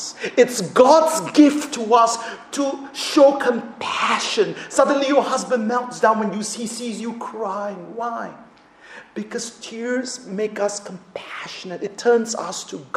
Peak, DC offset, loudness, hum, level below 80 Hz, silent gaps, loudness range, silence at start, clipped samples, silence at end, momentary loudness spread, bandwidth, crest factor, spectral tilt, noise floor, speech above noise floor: 0 dBFS; under 0.1%; -20 LUFS; none; -68 dBFS; none; 12 LU; 0 s; under 0.1%; 0.1 s; 16 LU; 15 kHz; 20 dB; -3.5 dB/octave; -46 dBFS; 26 dB